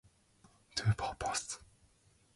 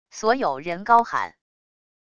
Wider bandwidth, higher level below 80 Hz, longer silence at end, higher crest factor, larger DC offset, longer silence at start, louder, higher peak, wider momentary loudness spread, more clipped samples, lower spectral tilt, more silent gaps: first, 11.5 kHz vs 9.6 kHz; about the same, -58 dBFS vs -62 dBFS; about the same, 0.7 s vs 0.8 s; about the same, 20 dB vs 20 dB; neither; first, 0.75 s vs 0.15 s; second, -37 LUFS vs -22 LUFS; second, -20 dBFS vs -4 dBFS; about the same, 10 LU vs 10 LU; neither; about the same, -3.5 dB/octave vs -4 dB/octave; neither